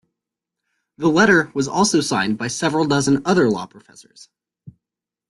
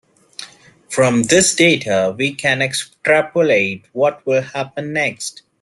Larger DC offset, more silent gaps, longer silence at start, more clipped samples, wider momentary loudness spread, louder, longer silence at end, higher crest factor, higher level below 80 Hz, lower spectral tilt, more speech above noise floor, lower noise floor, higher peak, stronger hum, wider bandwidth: neither; neither; first, 1 s vs 0.4 s; neither; second, 8 LU vs 15 LU; about the same, -18 LUFS vs -16 LUFS; first, 0.6 s vs 0.3 s; about the same, 18 dB vs 18 dB; about the same, -56 dBFS vs -58 dBFS; about the same, -4.5 dB/octave vs -3.5 dB/octave; first, 69 dB vs 25 dB; first, -87 dBFS vs -41 dBFS; about the same, -2 dBFS vs 0 dBFS; neither; about the same, 12.5 kHz vs 12.5 kHz